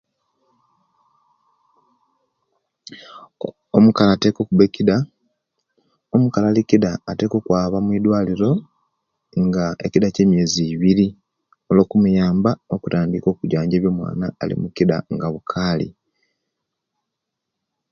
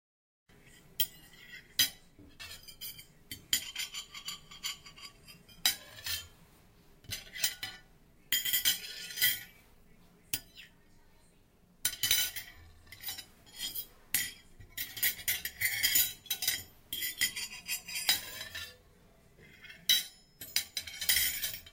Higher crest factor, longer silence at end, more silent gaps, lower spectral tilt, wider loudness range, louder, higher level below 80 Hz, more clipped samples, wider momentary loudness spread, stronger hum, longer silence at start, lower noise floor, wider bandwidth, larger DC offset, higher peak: second, 20 dB vs 26 dB; first, 2 s vs 0 s; neither; first, -7 dB/octave vs 1.5 dB/octave; about the same, 6 LU vs 6 LU; first, -18 LUFS vs -32 LUFS; first, -48 dBFS vs -62 dBFS; neither; second, 9 LU vs 22 LU; neither; first, 2.9 s vs 0.65 s; first, -80 dBFS vs -64 dBFS; second, 7.2 kHz vs 17 kHz; neither; first, 0 dBFS vs -10 dBFS